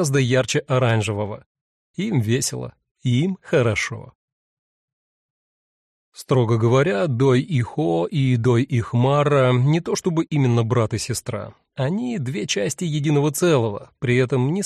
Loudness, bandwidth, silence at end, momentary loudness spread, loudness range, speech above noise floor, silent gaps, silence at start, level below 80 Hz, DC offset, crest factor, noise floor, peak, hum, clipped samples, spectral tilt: -20 LUFS; 13 kHz; 0 s; 10 LU; 6 LU; over 70 dB; 1.46-1.55 s, 1.61-1.94 s, 2.91-2.95 s, 4.15-6.12 s; 0 s; -54 dBFS; under 0.1%; 14 dB; under -90 dBFS; -6 dBFS; none; under 0.1%; -6 dB/octave